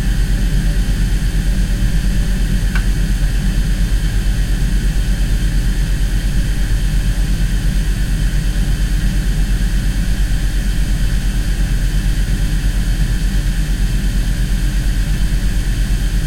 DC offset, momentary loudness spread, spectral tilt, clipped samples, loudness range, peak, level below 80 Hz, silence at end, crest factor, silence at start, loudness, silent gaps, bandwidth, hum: under 0.1%; 1 LU; -5 dB/octave; under 0.1%; 1 LU; -4 dBFS; -16 dBFS; 0 s; 10 dB; 0 s; -19 LUFS; none; 16 kHz; 50 Hz at -20 dBFS